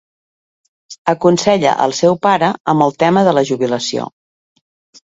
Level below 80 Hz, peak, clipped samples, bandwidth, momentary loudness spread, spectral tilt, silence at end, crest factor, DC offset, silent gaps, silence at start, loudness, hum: -56 dBFS; 0 dBFS; under 0.1%; 8 kHz; 8 LU; -5 dB/octave; 0.95 s; 16 dB; under 0.1%; 0.98-1.05 s, 2.60-2.64 s; 0.9 s; -14 LUFS; none